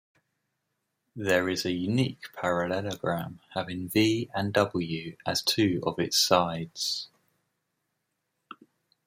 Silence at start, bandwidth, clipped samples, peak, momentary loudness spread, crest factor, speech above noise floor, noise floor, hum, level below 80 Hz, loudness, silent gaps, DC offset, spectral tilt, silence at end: 1.15 s; 16 kHz; under 0.1%; -6 dBFS; 10 LU; 24 dB; 53 dB; -80 dBFS; none; -66 dBFS; -28 LUFS; none; under 0.1%; -4 dB/octave; 0.55 s